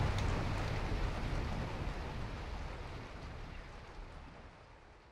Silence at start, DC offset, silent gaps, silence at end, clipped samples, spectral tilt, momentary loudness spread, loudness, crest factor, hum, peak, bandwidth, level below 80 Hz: 0 s; under 0.1%; none; 0 s; under 0.1%; -6 dB/octave; 17 LU; -42 LUFS; 16 dB; none; -24 dBFS; 12.5 kHz; -44 dBFS